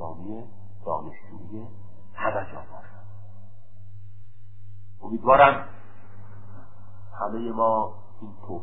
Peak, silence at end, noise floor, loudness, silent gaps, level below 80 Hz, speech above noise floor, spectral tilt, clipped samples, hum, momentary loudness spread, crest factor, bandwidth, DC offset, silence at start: -2 dBFS; 0 s; -48 dBFS; -23 LUFS; none; -54 dBFS; 26 dB; -10 dB/octave; under 0.1%; none; 28 LU; 26 dB; 4 kHz; 3%; 0 s